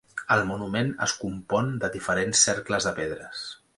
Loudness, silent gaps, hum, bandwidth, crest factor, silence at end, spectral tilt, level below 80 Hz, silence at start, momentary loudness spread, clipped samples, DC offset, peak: -25 LUFS; none; none; 11.5 kHz; 20 dB; 0.2 s; -3 dB/octave; -54 dBFS; 0.15 s; 12 LU; under 0.1%; under 0.1%; -6 dBFS